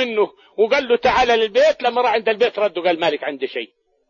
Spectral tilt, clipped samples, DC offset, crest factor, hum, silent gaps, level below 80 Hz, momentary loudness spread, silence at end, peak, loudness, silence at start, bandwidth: -3.5 dB/octave; under 0.1%; under 0.1%; 14 dB; none; none; -50 dBFS; 10 LU; 0.45 s; -4 dBFS; -18 LUFS; 0 s; 7.4 kHz